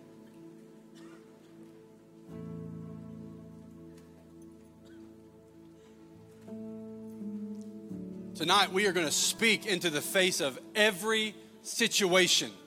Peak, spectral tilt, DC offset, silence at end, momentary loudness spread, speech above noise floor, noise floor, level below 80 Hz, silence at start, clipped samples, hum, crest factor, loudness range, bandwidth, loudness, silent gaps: -10 dBFS; -2 dB/octave; under 0.1%; 0 s; 23 LU; 26 dB; -55 dBFS; -74 dBFS; 0 s; under 0.1%; none; 24 dB; 22 LU; 17 kHz; -28 LUFS; none